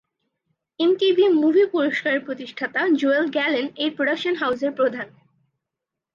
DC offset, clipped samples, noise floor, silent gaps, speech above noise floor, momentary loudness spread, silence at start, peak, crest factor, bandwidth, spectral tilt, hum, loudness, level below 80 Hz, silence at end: under 0.1%; under 0.1%; -85 dBFS; none; 64 dB; 9 LU; 0.8 s; -8 dBFS; 14 dB; 7.4 kHz; -5 dB/octave; none; -21 LUFS; -74 dBFS; 1.05 s